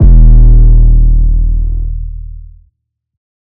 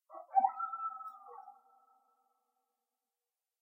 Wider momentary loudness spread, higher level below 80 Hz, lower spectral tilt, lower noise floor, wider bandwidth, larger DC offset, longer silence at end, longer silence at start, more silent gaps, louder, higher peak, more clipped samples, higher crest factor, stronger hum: about the same, 19 LU vs 21 LU; first, -6 dBFS vs under -90 dBFS; first, -13.5 dB/octave vs -5 dB/octave; second, -61 dBFS vs under -90 dBFS; second, 0.9 kHz vs 2.5 kHz; neither; second, 1.05 s vs 2.1 s; about the same, 0 s vs 0.1 s; neither; first, -10 LUFS vs -36 LUFS; first, 0 dBFS vs -16 dBFS; first, 9% vs under 0.1%; second, 6 dB vs 24 dB; neither